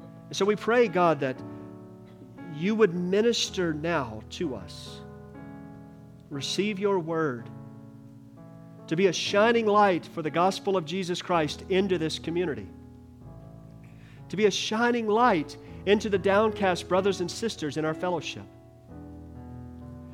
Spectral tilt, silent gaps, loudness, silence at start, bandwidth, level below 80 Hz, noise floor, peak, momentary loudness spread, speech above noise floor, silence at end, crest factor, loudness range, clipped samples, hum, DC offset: -5 dB/octave; none; -26 LUFS; 0 s; 14.5 kHz; -60 dBFS; -48 dBFS; -10 dBFS; 22 LU; 22 dB; 0 s; 18 dB; 7 LU; under 0.1%; none; under 0.1%